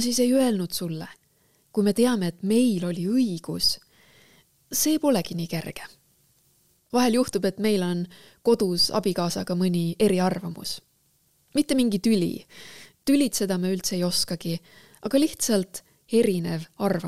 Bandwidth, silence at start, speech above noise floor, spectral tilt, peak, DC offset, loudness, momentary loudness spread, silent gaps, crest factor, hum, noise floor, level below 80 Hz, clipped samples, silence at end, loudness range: 16 kHz; 0 s; 42 dB; -4.5 dB/octave; -8 dBFS; 0.4%; -24 LUFS; 13 LU; none; 16 dB; none; -66 dBFS; -58 dBFS; under 0.1%; 0 s; 3 LU